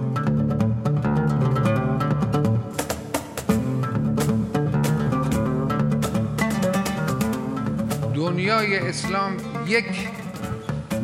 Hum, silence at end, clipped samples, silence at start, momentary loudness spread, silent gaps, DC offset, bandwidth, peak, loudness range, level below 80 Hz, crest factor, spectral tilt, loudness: none; 0 s; under 0.1%; 0 s; 7 LU; none; under 0.1%; 16 kHz; -6 dBFS; 1 LU; -44 dBFS; 16 dB; -6.5 dB/octave; -23 LUFS